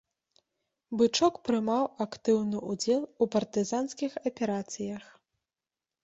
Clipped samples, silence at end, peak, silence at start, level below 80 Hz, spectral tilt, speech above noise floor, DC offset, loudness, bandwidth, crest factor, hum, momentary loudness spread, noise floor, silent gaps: under 0.1%; 1 s; -12 dBFS; 0.9 s; -70 dBFS; -4.5 dB/octave; over 61 dB; under 0.1%; -30 LUFS; 8.2 kHz; 20 dB; none; 9 LU; under -90 dBFS; none